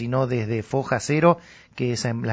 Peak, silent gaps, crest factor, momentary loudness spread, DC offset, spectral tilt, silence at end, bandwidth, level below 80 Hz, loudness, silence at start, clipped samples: -4 dBFS; none; 20 dB; 8 LU; under 0.1%; -6 dB/octave; 0 s; 8 kHz; -54 dBFS; -23 LUFS; 0 s; under 0.1%